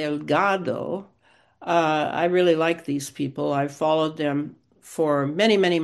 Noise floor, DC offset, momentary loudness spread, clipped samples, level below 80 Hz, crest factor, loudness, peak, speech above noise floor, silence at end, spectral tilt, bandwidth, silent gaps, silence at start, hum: -58 dBFS; under 0.1%; 10 LU; under 0.1%; -70 dBFS; 18 dB; -23 LUFS; -4 dBFS; 35 dB; 0 s; -5.5 dB/octave; 12.5 kHz; none; 0 s; none